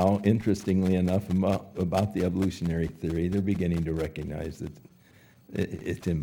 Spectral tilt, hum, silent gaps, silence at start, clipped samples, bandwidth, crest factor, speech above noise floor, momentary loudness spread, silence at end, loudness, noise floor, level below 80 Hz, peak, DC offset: -8 dB/octave; none; none; 0 s; under 0.1%; 16.5 kHz; 18 dB; 30 dB; 10 LU; 0 s; -28 LUFS; -57 dBFS; -46 dBFS; -10 dBFS; under 0.1%